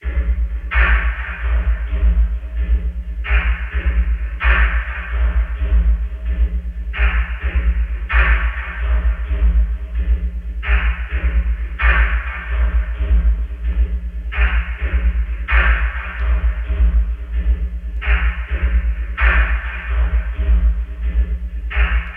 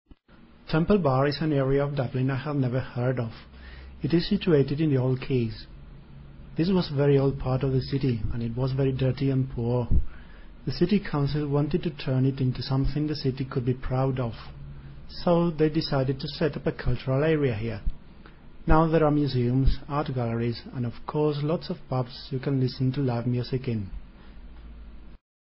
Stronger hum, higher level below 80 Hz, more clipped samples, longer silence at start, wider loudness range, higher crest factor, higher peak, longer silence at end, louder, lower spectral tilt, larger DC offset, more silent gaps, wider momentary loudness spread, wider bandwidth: neither; first, -16 dBFS vs -38 dBFS; neither; second, 0 s vs 0.65 s; about the same, 1 LU vs 3 LU; second, 16 dB vs 22 dB; first, 0 dBFS vs -4 dBFS; second, 0 s vs 0.25 s; first, -20 LUFS vs -26 LUFS; second, -8 dB/octave vs -11.5 dB/octave; neither; neither; second, 8 LU vs 12 LU; second, 3.5 kHz vs 5.8 kHz